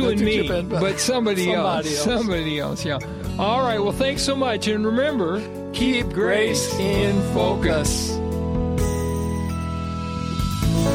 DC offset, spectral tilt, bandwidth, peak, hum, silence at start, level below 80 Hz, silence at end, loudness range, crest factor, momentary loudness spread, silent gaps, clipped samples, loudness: under 0.1%; -5 dB/octave; 16.5 kHz; -6 dBFS; none; 0 s; -34 dBFS; 0 s; 2 LU; 16 dB; 6 LU; none; under 0.1%; -22 LUFS